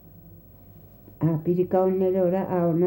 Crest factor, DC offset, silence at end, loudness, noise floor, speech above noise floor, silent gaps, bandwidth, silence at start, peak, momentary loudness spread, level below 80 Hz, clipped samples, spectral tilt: 14 dB; under 0.1%; 0 s; -24 LUFS; -49 dBFS; 26 dB; none; 16 kHz; 0.15 s; -10 dBFS; 4 LU; -56 dBFS; under 0.1%; -11.5 dB/octave